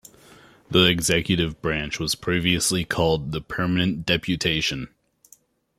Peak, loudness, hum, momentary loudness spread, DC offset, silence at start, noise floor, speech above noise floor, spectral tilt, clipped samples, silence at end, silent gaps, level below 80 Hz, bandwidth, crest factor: -2 dBFS; -22 LUFS; none; 8 LU; under 0.1%; 0.7 s; -57 dBFS; 34 dB; -4 dB/octave; under 0.1%; 0.9 s; none; -46 dBFS; 15.5 kHz; 22 dB